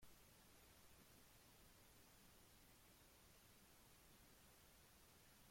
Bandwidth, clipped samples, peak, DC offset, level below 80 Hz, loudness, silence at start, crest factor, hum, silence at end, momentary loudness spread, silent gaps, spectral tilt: 16.5 kHz; under 0.1%; -54 dBFS; under 0.1%; -78 dBFS; -69 LUFS; 0 s; 16 dB; none; 0 s; 1 LU; none; -3 dB/octave